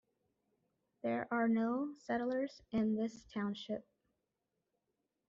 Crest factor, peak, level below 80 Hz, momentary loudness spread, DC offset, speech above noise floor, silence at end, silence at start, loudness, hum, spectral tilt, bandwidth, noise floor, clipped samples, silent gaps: 16 dB; -24 dBFS; -74 dBFS; 10 LU; under 0.1%; 50 dB; 1.5 s; 1.05 s; -38 LUFS; none; -5 dB/octave; 7.4 kHz; -87 dBFS; under 0.1%; none